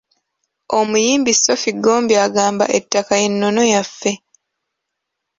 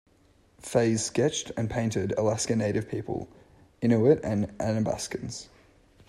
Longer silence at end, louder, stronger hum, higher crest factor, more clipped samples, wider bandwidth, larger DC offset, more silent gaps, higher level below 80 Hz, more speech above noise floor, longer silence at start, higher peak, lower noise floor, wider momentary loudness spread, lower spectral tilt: first, 1.25 s vs 0.65 s; first, -15 LUFS vs -27 LUFS; neither; about the same, 16 dB vs 20 dB; neither; second, 7.8 kHz vs 13 kHz; neither; neither; about the same, -60 dBFS vs -56 dBFS; first, 62 dB vs 35 dB; about the same, 0.7 s vs 0.65 s; first, 0 dBFS vs -8 dBFS; first, -78 dBFS vs -62 dBFS; second, 8 LU vs 13 LU; second, -2.5 dB/octave vs -5.5 dB/octave